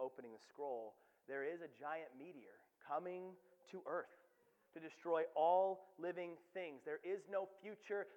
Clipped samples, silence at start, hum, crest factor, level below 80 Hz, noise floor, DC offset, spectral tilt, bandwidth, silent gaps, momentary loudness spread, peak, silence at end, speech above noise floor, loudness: under 0.1%; 0 s; none; 20 dB; under -90 dBFS; -76 dBFS; under 0.1%; -6 dB/octave; 19 kHz; none; 20 LU; -24 dBFS; 0 s; 31 dB; -45 LUFS